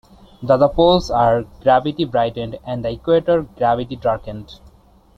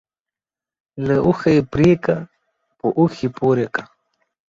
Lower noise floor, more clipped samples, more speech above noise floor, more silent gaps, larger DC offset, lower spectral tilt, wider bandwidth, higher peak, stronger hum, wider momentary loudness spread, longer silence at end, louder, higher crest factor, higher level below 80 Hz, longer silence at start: second, -50 dBFS vs under -90 dBFS; neither; second, 32 dB vs over 73 dB; neither; neither; about the same, -7 dB/octave vs -8 dB/octave; about the same, 7.8 kHz vs 7.6 kHz; about the same, -2 dBFS vs -2 dBFS; neither; about the same, 12 LU vs 10 LU; about the same, 0.6 s vs 0.65 s; about the same, -18 LUFS vs -18 LUFS; about the same, 16 dB vs 16 dB; first, -40 dBFS vs -48 dBFS; second, 0.4 s vs 0.95 s